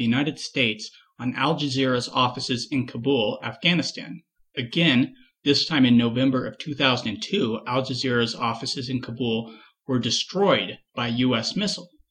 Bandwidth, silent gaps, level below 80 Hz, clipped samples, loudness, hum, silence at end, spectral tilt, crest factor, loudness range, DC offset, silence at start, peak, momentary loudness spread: 10 kHz; none; -62 dBFS; under 0.1%; -24 LUFS; none; 0.25 s; -5 dB/octave; 18 dB; 3 LU; under 0.1%; 0 s; -6 dBFS; 12 LU